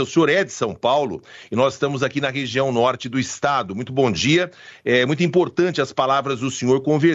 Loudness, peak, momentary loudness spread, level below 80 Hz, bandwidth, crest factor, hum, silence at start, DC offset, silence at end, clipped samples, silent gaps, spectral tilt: -20 LUFS; -4 dBFS; 7 LU; -58 dBFS; 8 kHz; 14 dB; none; 0 s; under 0.1%; 0 s; under 0.1%; none; -5 dB/octave